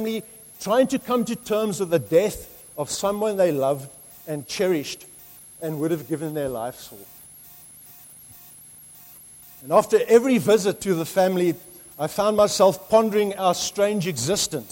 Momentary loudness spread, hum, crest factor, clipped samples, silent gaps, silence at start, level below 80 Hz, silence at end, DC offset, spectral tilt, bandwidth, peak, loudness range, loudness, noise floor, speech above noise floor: 24 LU; none; 20 dB; under 0.1%; none; 0 s; -58 dBFS; 0 s; under 0.1%; -4.5 dB/octave; 16.5 kHz; -4 dBFS; 11 LU; -22 LUFS; -46 dBFS; 25 dB